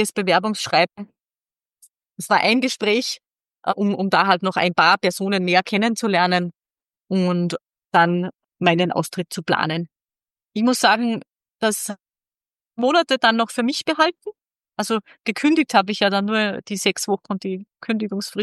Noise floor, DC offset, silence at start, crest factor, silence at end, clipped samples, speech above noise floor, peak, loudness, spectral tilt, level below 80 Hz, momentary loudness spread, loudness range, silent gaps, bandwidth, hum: under -90 dBFS; under 0.1%; 0 s; 20 dB; 0 s; under 0.1%; over 70 dB; -2 dBFS; -20 LUFS; -4 dB/octave; -72 dBFS; 13 LU; 3 LU; none; 12.5 kHz; none